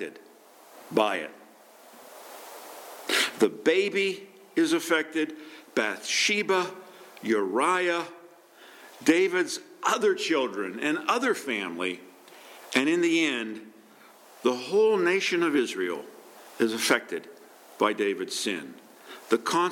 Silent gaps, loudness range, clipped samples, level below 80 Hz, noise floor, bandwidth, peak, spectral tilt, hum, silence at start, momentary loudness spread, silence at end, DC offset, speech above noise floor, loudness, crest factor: none; 3 LU; under 0.1%; -86 dBFS; -53 dBFS; 17.5 kHz; -6 dBFS; -3 dB/octave; none; 0 s; 20 LU; 0 s; under 0.1%; 27 dB; -26 LUFS; 22 dB